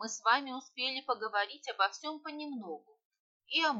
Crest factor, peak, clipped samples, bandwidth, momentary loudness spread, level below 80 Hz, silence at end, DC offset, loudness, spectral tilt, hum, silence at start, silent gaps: 22 dB; -14 dBFS; under 0.1%; 8.2 kHz; 13 LU; -84 dBFS; 0 s; under 0.1%; -34 LUFS; -1 dB/octave; none; 0 s; 3.05-3.11 s, 3.19-3.40 s